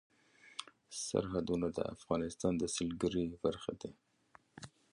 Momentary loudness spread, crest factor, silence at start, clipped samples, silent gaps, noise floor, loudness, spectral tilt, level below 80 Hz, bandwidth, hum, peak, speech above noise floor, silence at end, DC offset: 13 LU; 20 dB; 0.45 s; under 0.1%; none; -67 dBFS; -38 LUFS; -5 dB/octave; -60 dBFS; 11.5 kHz; none; -18 dBFS; 30 dB; 0.25 s; under 0.1%